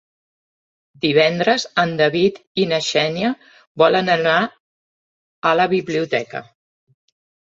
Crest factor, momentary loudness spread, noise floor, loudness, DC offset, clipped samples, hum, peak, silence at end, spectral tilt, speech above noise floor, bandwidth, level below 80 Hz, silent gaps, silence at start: 18 dB; 8 LU; under -90 dBFS; -18 LUFS; under 0.1%; under 0.1%; none; -2 dBFS; 1.1 s; -4.5 dB/octave; over 72 dB; 8 kHz; -62 dBFS; 2.47-2.55 s, 3.67-3.75 s, 4.60-5.42 s; 1.05 s